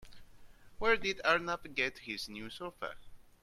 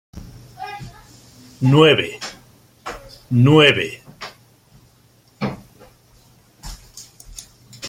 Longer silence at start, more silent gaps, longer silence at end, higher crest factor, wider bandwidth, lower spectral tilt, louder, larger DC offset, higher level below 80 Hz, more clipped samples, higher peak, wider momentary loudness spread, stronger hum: second, 0 s vs 0.15 s; neither; first, 0.2 s vs 0 s; about the same, 22 dB vs 20 dB; about the same, 15 kHz vs 16 kHz; second, -3 dB/octave vs -6 dB/octave; second, -35 LUFS vs -16 LUFS; neither; second, -58 dBFS vs -48 dBFS; neither; second, -14 dBFS vs 0 dBFS; second, 14 LU vs 27 LU; neither